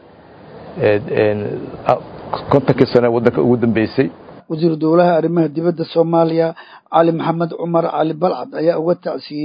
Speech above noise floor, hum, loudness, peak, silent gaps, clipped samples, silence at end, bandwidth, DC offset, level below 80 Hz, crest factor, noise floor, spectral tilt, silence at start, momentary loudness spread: 26 dB; none; -16 LUFS; 0 dBFS; none; under 0.1%; 0 s; 5.4 kHz; under 0.1%; -50 dBFS; 16 dB; -41 dBFS; -9.5 dB/octave; 0.45 s; 8 LU